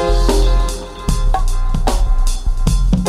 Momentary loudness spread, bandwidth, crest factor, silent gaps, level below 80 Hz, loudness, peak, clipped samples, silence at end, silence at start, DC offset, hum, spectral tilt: 6 LU; 13 kHz; 12 dB; none; -14 dBFS; -18 LUFS; -2 dBFS; under 0.1%; 0 s; 0 s; under 0.1%; none; -5.5 dB/octave